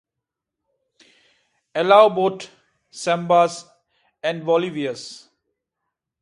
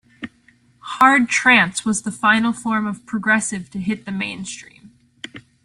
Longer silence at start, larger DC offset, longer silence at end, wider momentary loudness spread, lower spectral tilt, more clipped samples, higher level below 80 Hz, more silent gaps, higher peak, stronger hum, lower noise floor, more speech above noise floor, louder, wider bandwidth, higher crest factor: first, 1.75 s vs 0.2 s; neither; first, 1.05 s vs 0.25 s; about the same, 22 LU vs 23 LU; first, -5 dB/octave vs -3 dB/octave; neither; second, -74 dBFS vs -58 dBFS; neither; about the same, 0 dBFS vs 0 dBFS; neither; first, -84 dBFS vs -56 dBFS; first, 66 dB vs 37 dB; about the same, -19 LUFS vs -17 LUFS; second, 11 kHz vs 12.5 kHz; about the same, 22 dB vs 20 dB